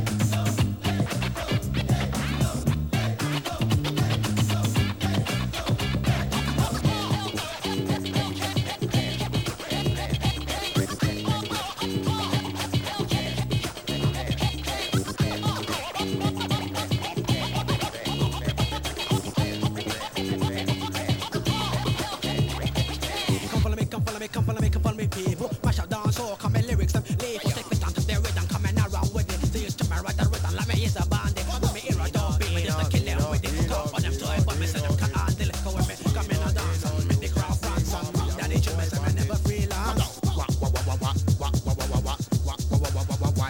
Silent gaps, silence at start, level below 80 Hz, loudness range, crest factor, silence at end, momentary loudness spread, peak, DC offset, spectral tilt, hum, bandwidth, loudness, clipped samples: none; 0 s; -34 dBFS; 2 LU; 16 dB; 0 s; 3 LU; -10 dBFS; 0.1%; -5 dB/octave; none; 18 kHz; -26 LUFS; under 0.1%